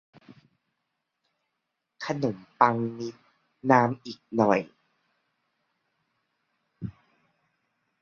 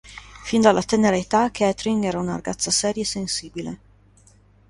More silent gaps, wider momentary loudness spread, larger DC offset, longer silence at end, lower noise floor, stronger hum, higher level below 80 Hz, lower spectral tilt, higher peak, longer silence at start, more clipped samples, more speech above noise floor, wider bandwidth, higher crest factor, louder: neither; first, 19 LU vs 16 LU; neither; first, 1.1 s vs 0.95 s; first, -82 dBFS vs -54 dBFS; second, none vs 50 Hz at -45 dBFS; second, -68 dBFS vs -50 dBFS; first, -7 dB/octave vs -4 dB/octave; about the same, -4 dBFS vs -2 dBFS; first, 2 s vs 0.05 s; neither; first, 57 dB vs 33 dB; second, 7.2 kHz vs 11.5 kHz; first, 28 dB vs 22 dB; second, -26 LUFS vs -21 LUFS